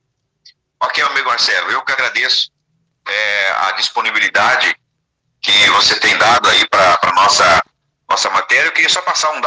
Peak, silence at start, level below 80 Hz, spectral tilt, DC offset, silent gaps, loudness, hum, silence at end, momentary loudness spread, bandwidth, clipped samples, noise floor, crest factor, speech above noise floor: 0 dBFS; 0.8 s; -54 dBFS; 0 dB/octave; under 0.1%; none; -12 LUFS; none; 0 s; 9 LU; 10.5 kHz; under 0.1%; -69 dBFS; 14 dB; 56 dB